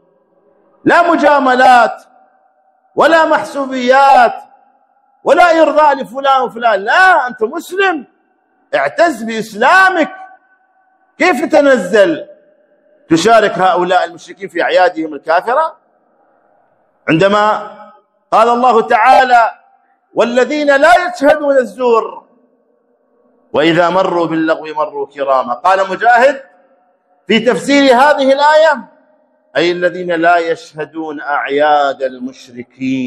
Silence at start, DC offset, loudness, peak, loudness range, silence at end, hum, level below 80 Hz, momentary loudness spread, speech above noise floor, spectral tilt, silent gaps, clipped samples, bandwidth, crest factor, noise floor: 0.85 s; under 0.1%; -11 LUFS; 0 dBFS; 4 LU; 0 s; none; -56 dBFS; 13 LU; 46 dB; -4.5 dB/octave; none; 0.4%; 13.5 kHz; 12 dB; -57 dBFS